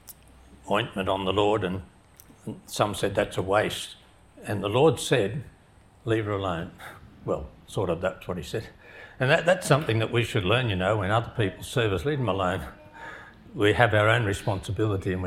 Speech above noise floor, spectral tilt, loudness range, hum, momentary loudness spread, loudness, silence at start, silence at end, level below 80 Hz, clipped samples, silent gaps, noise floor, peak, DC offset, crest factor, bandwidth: 30 dB; -5.5 dB/octave; 5 LU; none; 19 LU; -26 LUFS; 0.05 s; 0 s; -52 dBFS; under 0.1%; none; -55 dBFS; -2 dBFS; under 0.1%; 26 dB; 16 kHz